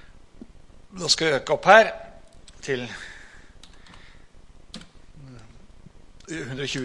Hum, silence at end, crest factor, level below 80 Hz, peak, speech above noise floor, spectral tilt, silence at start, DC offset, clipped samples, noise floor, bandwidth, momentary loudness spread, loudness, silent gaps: none; 0 s; 26 dB; -50 dBFS; 0 dBFS; 26 dB; -3 dB/octave; 0.35 s; under 0.1%; under 0.1%; -47 dBFS; 11.5 kHz; 28 LU; -21 LUFS; none